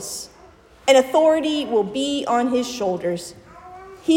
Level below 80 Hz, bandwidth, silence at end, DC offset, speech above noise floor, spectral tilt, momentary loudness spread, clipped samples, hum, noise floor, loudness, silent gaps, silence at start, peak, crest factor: -58 dBFS; 16.5 kHz; 0 s; under 0.1%; 29 dB; -3.5 dB/octave; 20 LU; under 0.1%; none; -48 dBFS; -20 LUFS; none; 0 s; -2 dBFS; 18 dB